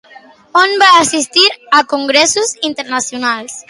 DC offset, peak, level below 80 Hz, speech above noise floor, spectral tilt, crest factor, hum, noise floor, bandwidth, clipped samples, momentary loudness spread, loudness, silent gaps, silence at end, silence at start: under 0.1%; 0 dBFS; -60 dBFS; 28 dB; -0.5 dB/octave; 12 dB; none; -41 dBFS; 11.5 kHz; under 0.1%; 10 LU; -11 LUFS; none; 0.1 s; 0.15 s